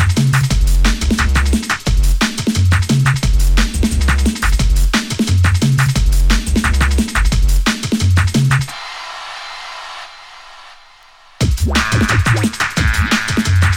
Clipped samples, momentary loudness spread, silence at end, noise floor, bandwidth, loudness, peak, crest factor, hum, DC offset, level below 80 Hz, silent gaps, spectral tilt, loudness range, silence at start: under 0.1%; 13 LU; 0 s; -44 dBFS; 17 kHz; -15 LUFS; 0 dBFS; 14 dB; none; under 0.1%; -18 dBFS; none; -4.5 dB/octave; 5 LU; 0 s